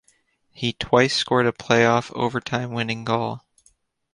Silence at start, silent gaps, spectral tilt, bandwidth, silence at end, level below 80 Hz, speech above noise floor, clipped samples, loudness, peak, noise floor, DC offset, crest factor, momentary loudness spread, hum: 0.6 s; none; -5 dB/octave; 11 kHz; 0.75 s; -56 dBFS; 42 dB; under 0.1%; -22 LUFS; -2 dBFS; -64 dBFS; under 0.1%; 22 dB; 10 LU; none